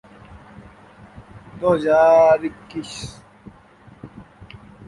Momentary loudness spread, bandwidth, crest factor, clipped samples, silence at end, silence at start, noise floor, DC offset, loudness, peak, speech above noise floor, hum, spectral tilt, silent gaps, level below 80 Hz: 29 LU; 11.5 kHz; 18 dB; under 0.1%; 0.65 s; 1.35 s; -48 dBFS; under 0.1%; -17 LUFS; -4 dBFS; 31 dB; none; -5.5 dB/octave; none; -52 dBFS